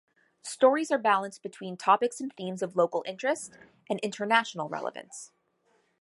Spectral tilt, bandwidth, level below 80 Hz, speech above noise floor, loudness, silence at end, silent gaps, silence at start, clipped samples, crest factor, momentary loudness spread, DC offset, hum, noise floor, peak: -4 dB/octave; 11.5 kHz; -82 dBFS; 42 dB; -28 LUFS; 0.75 s; none; 0.45 s; under 0.1%; 22 dB; 17 LU; under 0.1%; none; -70 dBFS; -8 dBFS